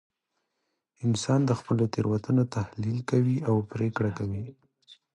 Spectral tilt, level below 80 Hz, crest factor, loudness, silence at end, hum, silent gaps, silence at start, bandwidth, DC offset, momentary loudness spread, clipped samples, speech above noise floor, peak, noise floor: -7 dB/octave; -56 dBFS; 18 dB; -28 LUFS; 0.25 s; none; none; 1 s; 11 kHz; under 0.1%; 8 LU; under 0.1%; 54 dB; -10 dBFS; -80 dBFS